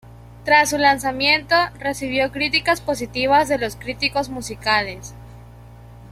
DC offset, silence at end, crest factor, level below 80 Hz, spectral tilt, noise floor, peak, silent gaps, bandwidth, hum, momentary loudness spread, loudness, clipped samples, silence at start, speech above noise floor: under 0.1%; 0 s; 20 dB; -44 dBFS; -3 dB/octave; -41 dBFS; -2 dBFS; none; 16 kHz; none; 11 LU; -19 LUFS; under 0.1%; 0.05 s; 22 dB